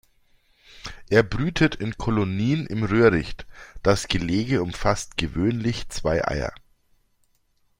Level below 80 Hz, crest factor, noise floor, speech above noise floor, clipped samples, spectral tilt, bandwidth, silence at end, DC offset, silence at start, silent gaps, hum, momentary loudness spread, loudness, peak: -40 dBFS; 22 dB; -65 dBFS; 43 dB; under 0.1%; -6 dB/octave; 16 kHz; 1.25 s; under 0.1%; 0.75 s; none; none; 14 LU; -23 LUFS; -2 dBFS